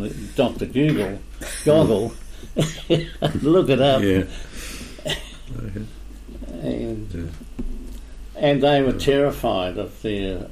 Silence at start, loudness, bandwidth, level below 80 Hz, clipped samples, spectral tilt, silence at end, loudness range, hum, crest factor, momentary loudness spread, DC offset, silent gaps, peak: 0 s; -21 LUFS; 15.5 kHz; -36 dBFS; under 0.1%; -6 dB/octave; 0 s; 11 LU; none; 16 dB; 19 LU; under 0.1%; none; -6 dBFS